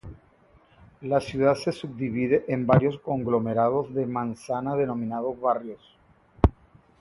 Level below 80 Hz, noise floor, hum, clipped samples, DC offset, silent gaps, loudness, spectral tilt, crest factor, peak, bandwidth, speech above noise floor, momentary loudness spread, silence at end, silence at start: -40 dBFS; -58 dBFS; none; under 0.1%; under 0.1%; none; -26 LUFS; -8 dB/octave; 26 dB; 0 dBFS; 11.5 kHz; 33 dB; 9 LU; 0.5 s; 0.05 s